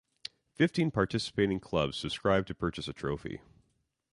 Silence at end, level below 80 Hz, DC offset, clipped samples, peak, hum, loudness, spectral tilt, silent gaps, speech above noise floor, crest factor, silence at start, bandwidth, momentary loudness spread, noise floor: 0.75 s; -54 dBFS; under 0.1%; under 0.1%; -12 dBFS; none; -31 LUFS; -6 dB/octave; none; 46 dB; 20 dB; 0.6 s; 11.5 kHz; 16 LU; -77 dBFS